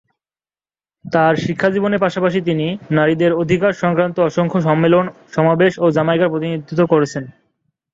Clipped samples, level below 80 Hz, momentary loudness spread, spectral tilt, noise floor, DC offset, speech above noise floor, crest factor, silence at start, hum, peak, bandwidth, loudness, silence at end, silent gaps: under 0.1%; -54 dBFS; 7 LU; -7 dB/octave; under -90 dBFS; under 0.1%; over 75 dB; 16 dB; 1.05 s; none; -2 dBFS; 7.8 kHz; -16 LUFS; 0.65 s; none